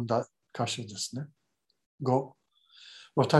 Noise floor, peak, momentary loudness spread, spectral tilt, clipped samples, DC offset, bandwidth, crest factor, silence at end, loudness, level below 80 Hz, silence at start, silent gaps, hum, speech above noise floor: -58 dBFS; -8 dBFS; 19 LU; -5.5 dB/octave; under 0.1%; under 0.1%; 12.5 kHz; 24 dB; 0 s; -33 LUFS; -70 dBFS; 0 s; 1.86-1.98 s; none; 27 dB